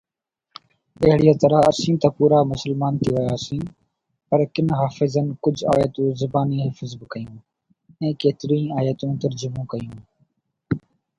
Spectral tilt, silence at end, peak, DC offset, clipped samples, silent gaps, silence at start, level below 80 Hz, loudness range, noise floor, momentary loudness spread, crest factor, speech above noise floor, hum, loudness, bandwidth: -7.5 dB/octave; 0.4 s; 0 dBFS; under 0.1%; under 0.1%; none; 1 s; -50 dBFS; 7 LU; -81 dBFS; 15 LU; 20 dB; 61 dB; none; -21 LUFS; 11 kHz